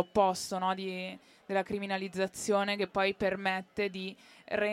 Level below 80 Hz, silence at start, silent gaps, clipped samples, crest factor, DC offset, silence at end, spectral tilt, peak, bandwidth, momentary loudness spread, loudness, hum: -66 dBFS; 0 s; none; under 0.1%; 20 dB; under 0.1%; 0 s; -4 dB/octave; -14 dBFS; 16 kHz; 11 LU; -33 LUFS; none